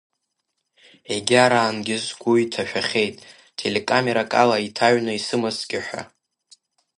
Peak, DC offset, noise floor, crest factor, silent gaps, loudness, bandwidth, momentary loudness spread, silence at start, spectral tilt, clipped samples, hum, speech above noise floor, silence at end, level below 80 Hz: 0 dBFS; under 0.1%; -77 dBFS; 22 dB; none; -21 LUFS; 11.5 kHz; 11 LU; 1.1 s; -4 dB/octave; under 0.1%; none; 56 dB; 0.9 s; -64 dBFS